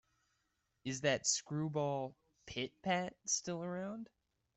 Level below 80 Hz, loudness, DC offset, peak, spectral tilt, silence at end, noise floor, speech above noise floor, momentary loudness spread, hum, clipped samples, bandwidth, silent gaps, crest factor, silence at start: -74 dBFS; -38 LUFS; under 0.1%; -20 dBFS; -3 dB/octave; 0.5 s; -83 dBFS; 44 dB; 13 LU; none; under 0.1%; 8.2 kHz; none; 22 dB; 0.85 s